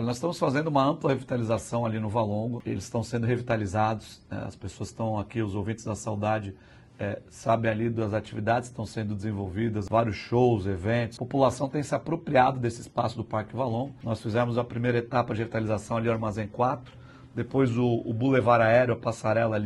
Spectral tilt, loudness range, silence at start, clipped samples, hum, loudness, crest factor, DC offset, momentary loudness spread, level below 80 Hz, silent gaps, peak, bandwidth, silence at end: -7 dB/octave; 5 LU; 0 s; under 0.1%; none; -28 LUFS; 20 dB; under 0.1%; 9 LU; -56 dBFS; none; -8 dBFS; 12 kHz; 0 s